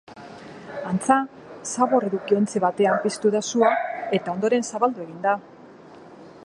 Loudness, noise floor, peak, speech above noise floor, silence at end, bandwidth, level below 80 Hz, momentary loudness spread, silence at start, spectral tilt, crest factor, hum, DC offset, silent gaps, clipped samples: -23 LUFS; -45 dBFS; -2 dBFS; 24 dB; 0 s; 11.5 kHz; -68 dBFS; 15 LU; 0.1 s; -5 dB/octave; 22 dB; none; under 0.1%; none; under 0.1%